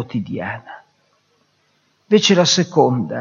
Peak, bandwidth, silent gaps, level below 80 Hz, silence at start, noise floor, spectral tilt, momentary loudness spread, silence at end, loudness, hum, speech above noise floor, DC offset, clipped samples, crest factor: 0 dBFS; 7.4 kHz; none; -64 dBFS; 0 s; -62 dBFS; -4 dB/octave; 14 LU; 0 s; -16 LUFS; none; 46 dB; under 0.1%; under 0.1%; 18 dB